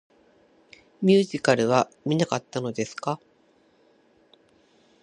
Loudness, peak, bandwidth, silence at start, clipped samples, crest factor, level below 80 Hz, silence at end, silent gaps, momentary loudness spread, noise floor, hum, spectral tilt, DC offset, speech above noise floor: -24 LUFS; -4 dBFS; 10.5 kHz; 1 s; under 0.1%; 22 dB; -68 dBFS; 1.85 s; none; 11 LU; -62 dBFS; none; -5.5 dB/octave; under 0.1%; 38 dB